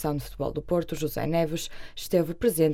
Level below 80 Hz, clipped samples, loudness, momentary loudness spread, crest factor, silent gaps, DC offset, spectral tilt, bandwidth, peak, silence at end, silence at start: -44 dBFS; under 0.1%; -28 LUFS; 9 LU; 16 dB; none; under 0.1%; -6 dB/octave; 17 kHz; -10 dBFS; 0 s; 0 s